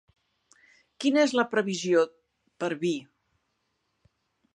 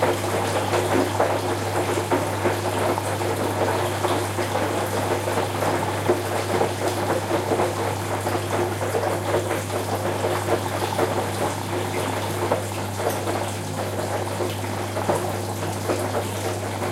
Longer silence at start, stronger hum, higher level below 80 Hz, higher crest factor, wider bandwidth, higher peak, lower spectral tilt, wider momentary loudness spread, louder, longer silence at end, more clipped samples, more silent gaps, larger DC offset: first, 1 s vs 0 s; neither; second, -78 dBFS vs -56 dBFS; about the same, 20 dB vs 18 dB; second, 11 kHz vs 16 kHz; second, -10 dBFS vs -6 dBFS; about the same, -4.5 dB/octave vs -5 dB/octave; first, 10 LU vs 4 LU; second, -27 LUFS vs -24 LUFS; first, 1.5 s vs 0 s; neither; neither; neither